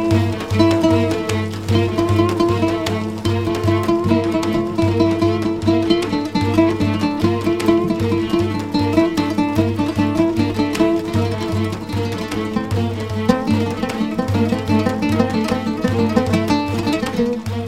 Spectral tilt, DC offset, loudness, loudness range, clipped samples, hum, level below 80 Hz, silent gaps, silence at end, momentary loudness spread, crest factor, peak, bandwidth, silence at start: -7 dB/octave; 0.4%; -18 LUFS; 2 LU; under 0.1%; none; -42 dBFS; none; 0 s; 5 LU; 18 dB; 0 dBFS; 15.5 kHz; 0 s